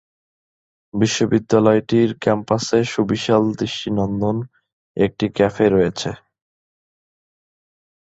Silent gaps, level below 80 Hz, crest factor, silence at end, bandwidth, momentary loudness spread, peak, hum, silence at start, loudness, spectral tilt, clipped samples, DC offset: 4.73-4.95 s; -50 dBFS; 18 dB; 2.05 s; 8.2 kHz; 12 LU; -2 dBFS; none; 0.95 s; -19 LUFS; -6 dB/octave; under 0.1%; under 0.1%